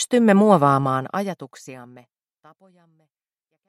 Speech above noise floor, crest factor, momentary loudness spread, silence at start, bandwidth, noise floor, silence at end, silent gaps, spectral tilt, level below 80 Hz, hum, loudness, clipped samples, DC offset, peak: 58 dB; 20 dB; 24 LU; 0 s; 14 kHz; -78 dBFS; 1.85 s; none; -6 dB/octave; -68 dBFS; none; -18 LUFS; under 0.1%; under 0.1%; -2 dBFS